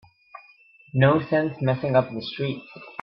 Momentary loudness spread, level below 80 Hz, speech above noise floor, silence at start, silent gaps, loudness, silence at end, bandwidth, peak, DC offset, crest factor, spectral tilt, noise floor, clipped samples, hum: 11 LU; -62 dBFS; 32 dB; 0.35 s; none; -23 LUFS; 0.1 s; 5.8 kHz; -6 dBFS; under 0.1%; 18 dB; -10 dB/octave; -54 dBFS; under 0.1%; none